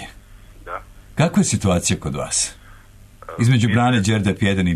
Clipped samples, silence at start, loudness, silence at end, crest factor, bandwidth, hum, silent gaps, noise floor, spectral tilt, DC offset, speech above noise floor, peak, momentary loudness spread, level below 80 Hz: under 0.1%; 0 s; -18 LUFS; 0 s; 14 dB; 13.5 kHz; none; none; -45 dBFS; -5 dB/octave; under 0.1%; 27 dB; -6 dBFS; 17 LU; -42 dBFS